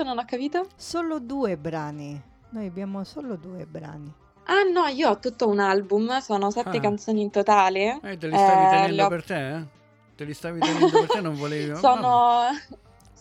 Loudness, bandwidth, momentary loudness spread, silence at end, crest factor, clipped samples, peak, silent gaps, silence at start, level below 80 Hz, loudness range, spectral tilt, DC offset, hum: -23 LUFS; 12 kHz; 19 LU; 0.45 s; 18 dB; under 0.1%; -6 dBFS; none; 0 s; -62 dBFS; 10 LU; -5.5 dB/octave; under 0.1%; none